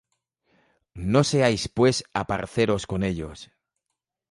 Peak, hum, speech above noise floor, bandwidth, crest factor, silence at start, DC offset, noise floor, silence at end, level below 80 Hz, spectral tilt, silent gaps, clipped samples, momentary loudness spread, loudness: -4 dBFS; none; 60 dB; 11.5 kHz; 22 dB; 0.95 s; under 0.1%; -83 dBFS; 0.85 s; -48 dBFS; -5.5 dB/octave; none; under 0.1%; 12 LU; -24 LUFS